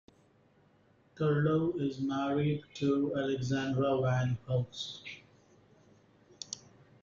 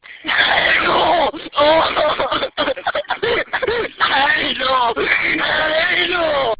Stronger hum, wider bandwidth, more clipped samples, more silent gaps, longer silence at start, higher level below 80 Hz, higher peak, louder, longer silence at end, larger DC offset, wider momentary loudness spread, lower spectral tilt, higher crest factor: neither; first, 7.6 kHz vs 4 kHz; neither; neither; first, 1.15 s vs 0.1 s; second, -66 dBFS vs -46 dBFS; second, -18 dBFS vs 0 dBFS; second, -32 LUFS vs -16 LUFS; first, 0.45 s vs 0.05 s; neither; first, 14 LU vs 6 LU; about the same, -6.5 dB/octave vs -6.5 dB/octave; about the same, 16 dB vs 16 dB